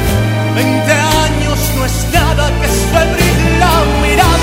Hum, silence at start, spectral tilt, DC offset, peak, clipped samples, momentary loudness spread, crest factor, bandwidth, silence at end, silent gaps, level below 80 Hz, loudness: none; 0 s; -4.5 dB/octave; under 0.1%; 0 dBFS; under 0.1%; 4 LU; 10 dB; 16.5 kHz; 0 s; none; -18 dBFS; -12 LUFS